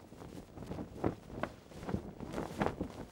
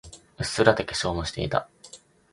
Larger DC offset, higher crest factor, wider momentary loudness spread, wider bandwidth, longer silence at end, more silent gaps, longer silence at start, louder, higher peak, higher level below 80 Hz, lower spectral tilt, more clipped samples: neither; about the same, 26 dB vs 26 dB; second, 12 LU vs 24 LU; first, 19 kHz vs 11.5 kHz; second, 0 s vs 0.35 s; neither; about the same, 0 s vs 0.05 s; second, -42 LUFS vs -25 LUFS; second, -16 dBFS vs 0 dBFS; second, -56 dBFS vs -46 dBFS; first, -7 dB/octave vs -4.5 dB/octave; neither